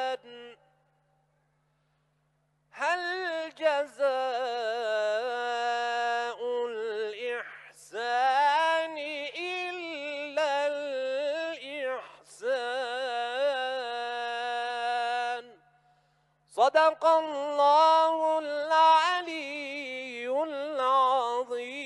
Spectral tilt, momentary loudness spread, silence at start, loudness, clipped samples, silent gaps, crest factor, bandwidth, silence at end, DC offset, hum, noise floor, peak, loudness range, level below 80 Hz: -1.5 dB/octave; 12 LU; 0 s; -28 LUFS; under 0.1%; none; 18 dB; 12 kHz; 0 s; under 0.1%; none; -73 dBFS; -10 dBFS; 8 LU; -84 dBFS